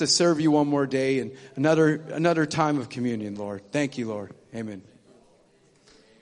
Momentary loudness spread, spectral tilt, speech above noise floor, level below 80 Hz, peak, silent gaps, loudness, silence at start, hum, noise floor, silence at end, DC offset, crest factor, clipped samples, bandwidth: 16 LU; -4.5 dB/octave; 36 dB; -68 dBFS; -8 dBFS; none; -24 LUFS; 0 s; none; -60 dBFS; 1.4 s; under 0.1%; 18 dB; under 0.1%; 10.5 kHz